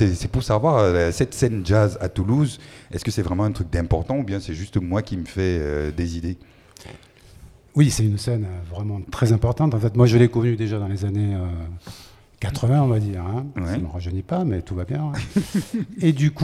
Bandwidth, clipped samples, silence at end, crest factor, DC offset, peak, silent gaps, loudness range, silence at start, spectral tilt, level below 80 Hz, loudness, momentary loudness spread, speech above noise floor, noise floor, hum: 13.5 kHz; under 0.1%; 0 s; 18 dB; under 0.1%; -2 dBFS; none; 5 LU; 0 s; -7 dB/octave; -38 dBFS; -22 LUFS; 11 LU; 26 dB; -47 dBFS; none